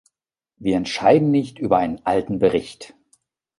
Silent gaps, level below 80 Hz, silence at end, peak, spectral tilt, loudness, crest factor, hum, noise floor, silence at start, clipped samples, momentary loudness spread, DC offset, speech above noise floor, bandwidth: none; -52 dBFS; 0.75 s; -2 dBFS; -6.5 dB/octave; -20 LUFS; 18 dB; none; -82 dBFS; 0.6 s; under 0.1%; 11 LU; under 0.1%; 63 dB; 11.5 kHz